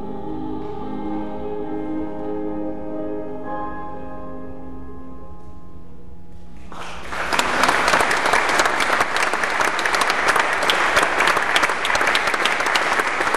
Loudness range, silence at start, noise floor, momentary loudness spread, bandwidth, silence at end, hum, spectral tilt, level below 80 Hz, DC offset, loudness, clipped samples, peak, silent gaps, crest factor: 17 LU; 0 s; -42 dBFS; 18 LU; 14 kHz; 0 s; none; -2 dB/octave; -46 dBFS; 4%; -20 LUFS; under 0.1%; 0 dBFS; none; 22 dB